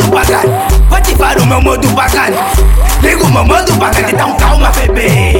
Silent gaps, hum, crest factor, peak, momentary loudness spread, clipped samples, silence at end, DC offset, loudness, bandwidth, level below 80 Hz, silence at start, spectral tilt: none; none; 8 dB; 0 dBFS; 2 LU; under 0.1%; 0 s; under 0.1%; -9 LUFS; 17 kHz; -12 dBFS; 0 s; -5 dB/octave